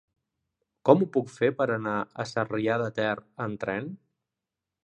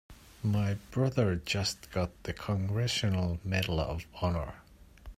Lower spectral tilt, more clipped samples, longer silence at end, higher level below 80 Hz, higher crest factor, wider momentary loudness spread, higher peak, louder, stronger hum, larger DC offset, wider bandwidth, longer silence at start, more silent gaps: first, -7 dB/octave vs -5.5 dB/octave; neither; first, 0.9 s vs 0.05 s; second, -68 dBFS vs -50 dBFS; first, 26 dB vs 18 dB; first, 11 LU vs 7 LU; first, -4 dBFS vs -14 dBFS; first, -27 LUFS vs -32 LUFS; neither; neither; second, 9.2 kHz vs 15.5 kHz; first, 0.85 s vs 0.1 s; neither